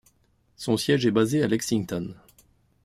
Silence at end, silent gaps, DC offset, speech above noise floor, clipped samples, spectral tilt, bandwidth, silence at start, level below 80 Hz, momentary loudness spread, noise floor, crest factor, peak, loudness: 0.7 s; none; under 0.1%; 41 dB; under 0.1%; -5.5 dB/octave; 15.5 kHz; 0.6 s; -60 dBFS; 12 LU; -65 dBFS; 18 dB; -8 dBFS; -25 LUFS